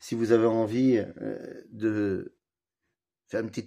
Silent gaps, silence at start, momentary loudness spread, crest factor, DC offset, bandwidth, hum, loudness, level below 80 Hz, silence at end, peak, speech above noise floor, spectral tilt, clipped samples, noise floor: none; 0 s; 15 LU; 20 dB; under 0.1%; 11.5 kHz; none; -27 LUFS; -70 dBFS; 0 s; -8 dBFS; 59 dB; -7 dB/octave; under 0.1%; -86 dBFS